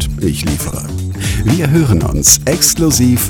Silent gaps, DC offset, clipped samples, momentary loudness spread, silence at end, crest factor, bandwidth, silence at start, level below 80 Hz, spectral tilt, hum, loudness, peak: none; under 0.1%; 0.3%; 11 LU; 0 s; 12 dB; over 20 kHz; 0 s; -24 dBFS; -4 dB/octave; none; -12 LUFS; 0 dBFS